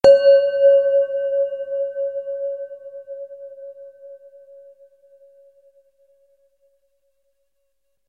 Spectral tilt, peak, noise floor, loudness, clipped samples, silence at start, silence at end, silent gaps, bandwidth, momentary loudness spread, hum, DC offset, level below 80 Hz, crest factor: -4.5 dB/octave; 0 dBFS; -75 dBFS; -18 LUFS; under 0.1%; 0.05 s; 3.95 s; none; 7.4 kHz; 24 LU; none; under 0.1%; -60 dBFS; 20 dB